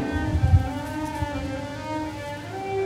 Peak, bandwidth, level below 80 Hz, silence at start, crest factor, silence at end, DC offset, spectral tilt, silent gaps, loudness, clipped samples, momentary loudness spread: -6 dBFS; 13.5 kHz; -34 dBFS; 0 s; 20 dB; 0 s; under 0.1%; -7 dB/octave; none; -27 LUFS; under 0.1%; 11 LU